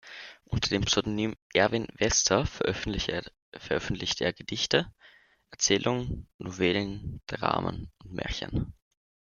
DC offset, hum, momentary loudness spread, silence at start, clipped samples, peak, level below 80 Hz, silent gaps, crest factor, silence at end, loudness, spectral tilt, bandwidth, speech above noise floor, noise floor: under 0.1%; none; 15 LU; 0.05 s; under 0.1%; -6 dBFS; -46 dBFS; 1.42-1.50 s, 3.42-3.52 s, 6.34-6.39 s; 24 dB; 0.65 s; -29 LUFS; -3.5 dB/octave; 10.5 kHz; 30 dB; -59 dBFS